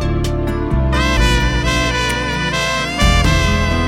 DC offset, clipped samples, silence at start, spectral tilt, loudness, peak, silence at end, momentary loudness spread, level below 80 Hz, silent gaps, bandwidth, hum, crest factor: under 0.1%; under 0.1%; 0 s; -4.5 dB/octave; -16 LUFS; 0 dBFS; 0 s; 5 LU; -20 dBFS; none; 15.5 kHz; none; 14 dB